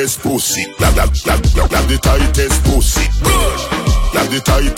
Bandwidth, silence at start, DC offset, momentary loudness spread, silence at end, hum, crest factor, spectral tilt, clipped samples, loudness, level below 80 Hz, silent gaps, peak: 16.5 kHz; 0 s; under 0.1%; 3 LU; 0 s; none; 12 dB; -4 dB/octave; under 0.1%; -14 LUFS; -14 dBFS; none; 0 dBFS